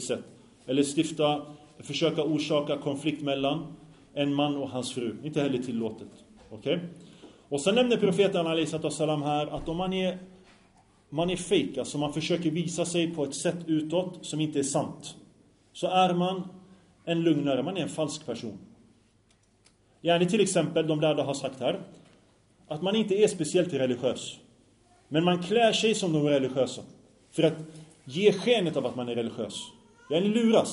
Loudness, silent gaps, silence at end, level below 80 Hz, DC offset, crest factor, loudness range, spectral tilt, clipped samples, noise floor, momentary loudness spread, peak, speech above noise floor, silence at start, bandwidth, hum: -28 LUFS; none; 0 s; -62 dBFS; under 0.1%; 20 dB; 4 LU; -5 dB/octave; under 0.1%; -65 dBFS; 14 LU; -8 dBFS; 37 dB; 0 s; 11 kHz; none